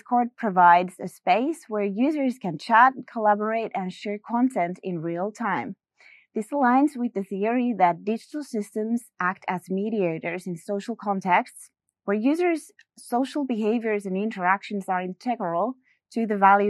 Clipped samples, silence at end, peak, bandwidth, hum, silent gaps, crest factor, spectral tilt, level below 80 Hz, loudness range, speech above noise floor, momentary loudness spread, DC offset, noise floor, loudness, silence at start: under 0.1%; 0 s; -4 dBFS; 12.5 kHz; none; none; 20 dB; -6.5 dB/octave; -84 dBFS; 5 LU; 32 dB; 11 LU; under 0.1%; -56 dBFS; -25 LUFS; 0.1 s